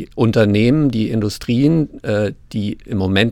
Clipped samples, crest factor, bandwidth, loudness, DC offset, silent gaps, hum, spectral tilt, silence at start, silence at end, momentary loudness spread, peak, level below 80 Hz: under 0.1%; 14 dB; 15.5 kHz; -17 LUFS; under 0.1%; none; none; -7 dB/octave; 0 s; 0 s; 9 LU; -2 dBFS; -42 dBFS